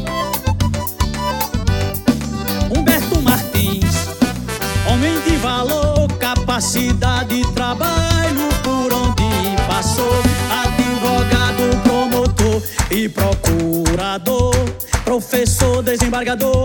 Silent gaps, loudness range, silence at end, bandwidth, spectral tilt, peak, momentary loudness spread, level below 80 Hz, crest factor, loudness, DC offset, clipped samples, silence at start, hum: none; 1 LU; 0 s; 19.5 kHz; -5 dB/octave; 0 dBFS; 4 LU; -26 dBFS; 16 dB; -17 LUFS; under 0.1%; under 0.1%; 0 s; none